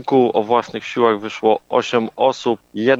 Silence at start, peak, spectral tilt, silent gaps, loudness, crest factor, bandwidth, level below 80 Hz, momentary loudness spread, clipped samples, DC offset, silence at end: 0 s; -2 dBFS; -5.5 dB/octave; none; -18 LUFS; 16 dB; 7.8 kHz; -64 dBFS; 6 LU; under 0.1%; under 0.1%; 0 s